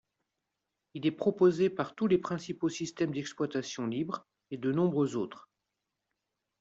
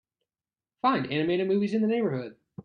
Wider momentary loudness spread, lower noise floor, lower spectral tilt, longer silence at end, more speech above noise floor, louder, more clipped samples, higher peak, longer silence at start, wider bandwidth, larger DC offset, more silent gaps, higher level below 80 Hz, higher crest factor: first, 11 LU vs 7 LU; second, -86 dBFS vs under -90 dBFS; second, -6.5 dB/octave vs -8 dB/octave; first, 1.2 s vs 0.05 s; second, 55 dB vs over 64 dB; second, -32 LUFS vs -27 LUFS; neither; about the same, -14 dBFS vs -12 dBFS; about the same, 0.95 s vs 0.85 s; first, 7.8 kHz vs 6.8 kHz; neither; neither; about the same, -72 dBFS vs -70 dBFS; about the same, 20 dB vs 16 dB